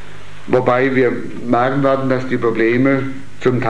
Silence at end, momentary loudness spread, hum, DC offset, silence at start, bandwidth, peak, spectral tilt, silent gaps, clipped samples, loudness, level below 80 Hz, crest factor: 0 s; 6 LU; none; 6%; 0 s; 10 kHz; 0 dBFS; -8 dB/octave; none; under 0.1%; -16 LUFS; -50 dBFS; 16 dB